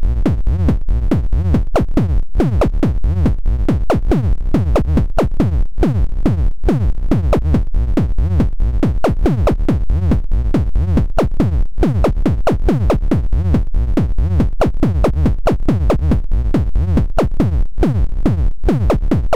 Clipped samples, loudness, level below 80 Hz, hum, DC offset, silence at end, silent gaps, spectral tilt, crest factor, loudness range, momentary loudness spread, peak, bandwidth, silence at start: under 0.1%; -17 LUFS; -16 dBFS; none; 7%; 0 s; none; -9 dB/octave; 8 dB; 1 LU; 2 LU; -6 dBFS; 9.2 kHz; 0 s